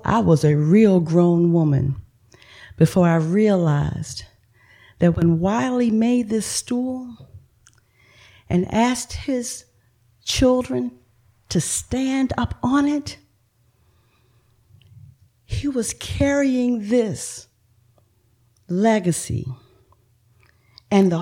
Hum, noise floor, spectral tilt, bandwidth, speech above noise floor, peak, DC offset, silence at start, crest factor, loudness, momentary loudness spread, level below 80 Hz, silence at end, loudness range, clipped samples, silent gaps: none; -62 dBFS; -6 dB/octave; 16 kHz; 43 dB; -4 dBFS; under 0.1%; 0.05 s; 18 dB; -20 LUFS; 14 LU; -44 dBFS; 0 s; 7 LU; under 0.1%; none